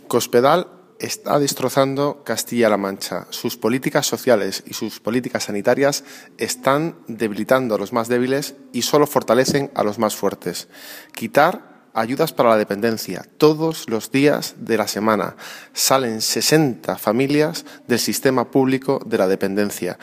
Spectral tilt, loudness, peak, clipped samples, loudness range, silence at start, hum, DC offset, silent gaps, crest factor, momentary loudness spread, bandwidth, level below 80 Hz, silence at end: -4 dB/octave; -19 LUFS; 0 dBFS; under 0.1%; 2 LU; 0.1 s; none; under 0.1%; none; 20 dB; 11 LU; 15.5 kHz; -66 dBFS; 0.05 s